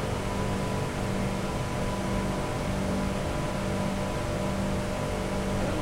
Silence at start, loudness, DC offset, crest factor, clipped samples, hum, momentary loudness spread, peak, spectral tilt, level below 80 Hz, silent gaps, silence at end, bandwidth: 0 s; -30 LUFS; 0.2%; 14 dB; under 0.1%; none; 1 LU; -16 dBFS; -6 dB/octave; -38 dBFS; none; 0 s; 16 kHz